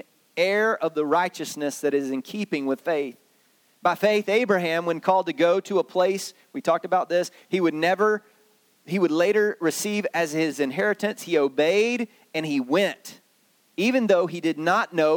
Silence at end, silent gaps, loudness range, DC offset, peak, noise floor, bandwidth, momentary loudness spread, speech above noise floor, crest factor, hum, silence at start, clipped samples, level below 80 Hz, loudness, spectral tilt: 0 s; none; 2 LU; under 0.1%; -6 dBFS; -63 dBFS; 19 kHz; 9 LU; 40 dB; 18 dB; none; 0.35 s; under 0.1%; -78 dBFS; -24 LUFS; -4.5 dB/octave